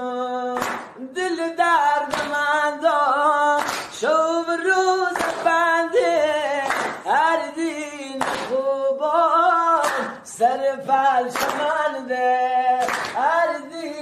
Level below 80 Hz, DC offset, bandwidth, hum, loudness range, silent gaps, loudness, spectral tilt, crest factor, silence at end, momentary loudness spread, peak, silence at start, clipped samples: -64 dBFS; under 0.1%; 13 kHz; none; 2 LU; none; -20 LUFS; -2.5 dB/octave; 14 dB; 0 s; 8 LU; -6 dBFS; 0 s; under 0.1%